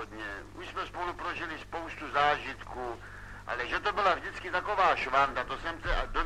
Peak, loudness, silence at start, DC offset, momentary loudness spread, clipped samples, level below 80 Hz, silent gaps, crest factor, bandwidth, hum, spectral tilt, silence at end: -14 dBFS; -31 LUFS; 0 s; 0.1%; 13 LU; under 0.1%; -44 dBFS; none; 18 dB; 13.5 kHz; none; -4 dB/octave; 0 s